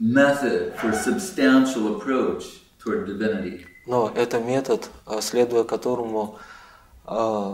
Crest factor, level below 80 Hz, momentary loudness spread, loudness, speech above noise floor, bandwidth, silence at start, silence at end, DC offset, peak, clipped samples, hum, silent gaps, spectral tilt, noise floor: 18 dB; -56 dBFS; 14 LU; -23 LUFS; 26 dB; 16 kHz; 0 s; 0 s; under 0.1%; -6 dBFS; under 0.1%; none; none; -5 dB/octave; -49 dBFS